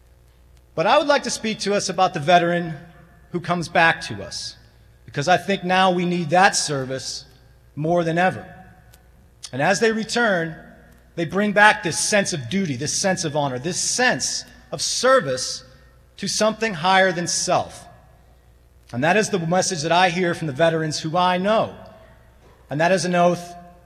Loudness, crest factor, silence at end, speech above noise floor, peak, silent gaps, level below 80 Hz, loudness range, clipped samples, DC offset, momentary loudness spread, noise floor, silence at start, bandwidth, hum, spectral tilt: -20 LUFS; 22 dB; 0.15 s; 32 dB; 0 dBFS; none; -54 dBFS; 3 LU; under 0.1%; under 0.1%; 14 LU; -52 dBFS; 0.75 s; 14.5 kHz; none; -3.5 dB/octave